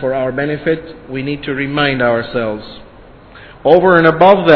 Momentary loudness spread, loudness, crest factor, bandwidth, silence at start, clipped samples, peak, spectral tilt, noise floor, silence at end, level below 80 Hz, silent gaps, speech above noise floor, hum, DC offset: 14 LU; -13 LUFS; 14 dB; 5.4 kHz; 0 s; 0.6%; 0 dBFS; -8.5 dB/octave; -39 dBFS; 0 s; -42 dBFS; none; 26 dB; none; under 0.1%